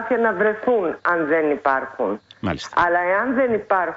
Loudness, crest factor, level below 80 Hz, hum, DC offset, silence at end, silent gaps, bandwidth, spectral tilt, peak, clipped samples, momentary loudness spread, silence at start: -20 LUFS; 14 dB; -54 dBFS; none; under 0.1%; 0 s; none; 8 kHz; -6 dB/octave; -6 dBFS; under 0.1%; 8 LU; 0 s